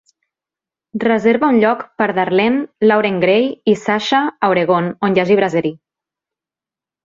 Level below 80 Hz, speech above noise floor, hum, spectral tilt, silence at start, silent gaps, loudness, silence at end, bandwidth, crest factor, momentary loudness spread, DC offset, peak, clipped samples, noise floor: -58 dBFS; 74 dB; none; -6.5 dB/octave; 0.95 s; none; -15 LUFS; 1.3 s; 7.6 kHz; 16 dB; 5 LU; under 0.1%; -2 dBFS; under 0.1%; -89 dBFS